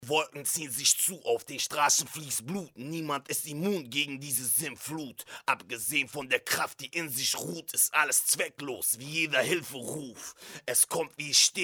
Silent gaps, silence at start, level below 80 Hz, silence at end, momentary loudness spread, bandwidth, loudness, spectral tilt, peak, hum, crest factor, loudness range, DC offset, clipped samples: none; 0 s; -76 dBFS; 0 s; 13 LU; over 20 kHz; -28 LUFS; -1 dB/octave; -8 dBFS; none; 22 dB; 4 LU; under 0.1%; under 0.1%